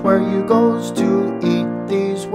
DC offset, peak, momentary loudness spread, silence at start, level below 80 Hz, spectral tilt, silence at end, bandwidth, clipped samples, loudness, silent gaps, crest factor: under 0.1%; -2 dBFS; 5 LU; 0 s; -60 dBFS; -7 dB/octave; 0 s; 14 kHz; under 0.1%; -17 LUFS; none; 14 dB